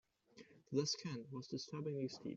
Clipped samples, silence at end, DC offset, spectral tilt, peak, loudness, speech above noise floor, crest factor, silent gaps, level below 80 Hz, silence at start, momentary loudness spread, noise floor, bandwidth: under 0.1%; 0 s; under 0.1%; -5.5 dB/octave; -24 dBFS; -44 LUFS; 22 dB; 20 dB; none; -82 dBFS; 0.35 s; 23 LU; -65 dBFS; 7.8 kHz